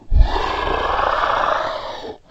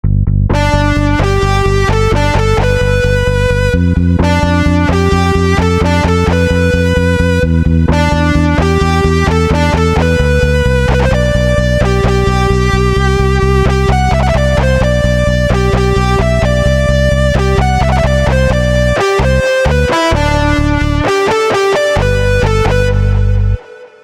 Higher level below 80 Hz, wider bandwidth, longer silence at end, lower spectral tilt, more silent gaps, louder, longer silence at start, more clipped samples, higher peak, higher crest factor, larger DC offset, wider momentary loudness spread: second, -22 dBFS vs -16 dBFS; second, 7.8 kHz vs 13.5 kHz; about the same, 0.15 s vs 0.15 s; about the same, -5.5 dB/octave vs -6.5 dB/octave; neither; second, -19 LUFS vs -11 LUFS; about the same, 0.05 s vs 0.05 s; neither; about the same, 0 dBFS vs 0 dBFS; first, 18 dB vs 10 dB; neither; first, 10 LU vs 1 LU